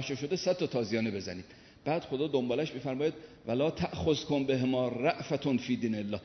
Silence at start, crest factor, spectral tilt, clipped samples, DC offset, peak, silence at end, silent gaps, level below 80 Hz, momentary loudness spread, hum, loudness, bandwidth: 0 s; 18 dB; -6 dB/octave; under 0.1%; under 0.1%; -14 dBFS; 0 s; none; -60 dBFS; 6 LU; none; -32 LUFS; 6.4 kHz